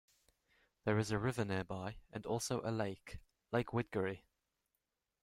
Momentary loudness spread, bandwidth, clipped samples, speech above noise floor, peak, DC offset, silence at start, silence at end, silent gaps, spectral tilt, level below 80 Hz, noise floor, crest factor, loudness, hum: 13 LU; 15.5 kHz; under 0.1%; 49 dB; -20 dBFS; under 0.1%; 0.85 s; 1.05 s; none; -5.5 dB/octave; -64 dBFS; -88 dBFS; 22 dB; -40 LUFS; none